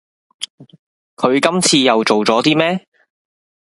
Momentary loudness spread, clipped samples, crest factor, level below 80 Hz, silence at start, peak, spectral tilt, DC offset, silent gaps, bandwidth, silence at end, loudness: 17 LU; under 0.1%; 18 dB; -62 dBFS; 0.4 s; 0 dBFS; -3.5 dB/octave; under 0.1%; 0.50-0.58 s, 0.79-1.17 s; 11.5 kHz; 0.9 s; -14 LUFS